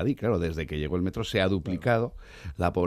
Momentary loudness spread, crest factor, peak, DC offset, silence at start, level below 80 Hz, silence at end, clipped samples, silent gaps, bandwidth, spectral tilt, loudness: 8 LU; 16 dB; -12 dBFS; under 0.1%; 0 s; -46 dBFS; 0 s; under 0.1%; none; 14.5 kHz; -7 dB/octave; -28 LUFS